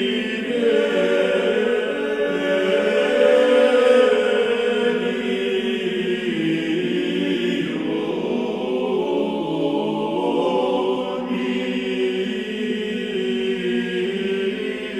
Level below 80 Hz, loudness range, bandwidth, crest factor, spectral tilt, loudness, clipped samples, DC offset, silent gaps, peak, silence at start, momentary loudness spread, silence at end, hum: -60 dBFS; 6 LU; 12 kHz; 16 dB; -5.5 dB/octave; -20 LUFS; under 0.1%; under 0.1%; none; -4 dBFS; 0 s; 8 LU; 0 s; none